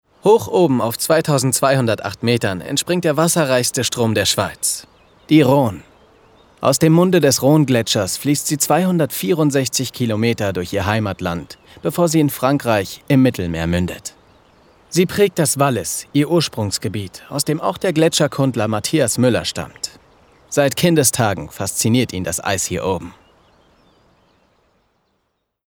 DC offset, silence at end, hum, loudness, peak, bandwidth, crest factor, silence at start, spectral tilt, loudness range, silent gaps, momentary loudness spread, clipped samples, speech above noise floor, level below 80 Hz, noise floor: under 0.1%; 2.55 s; none; -17 LUFS; -2 dBFS; over 20 kHz; 16 dB; 0.25 s; -4.5 dB/octave; 4 LU; none; 10 LU; under 0.1%; 54 dB; -48 dBFS; -71 dBFS